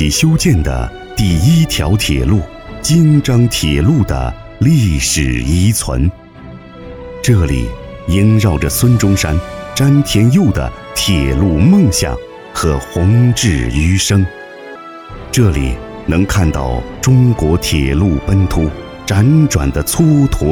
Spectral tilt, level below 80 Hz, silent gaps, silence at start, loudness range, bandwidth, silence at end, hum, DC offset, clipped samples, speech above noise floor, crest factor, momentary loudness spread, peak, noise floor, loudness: -5.5 dB/octave; -22 dBFS; none; 0 s; 3 LU; 18.5 kHz; 0 s; none; under 0.1%; under 0.1%; 22 dB; 10 dB; 12 LU; -2 dBFS; -33 dBFS; -13 LUFS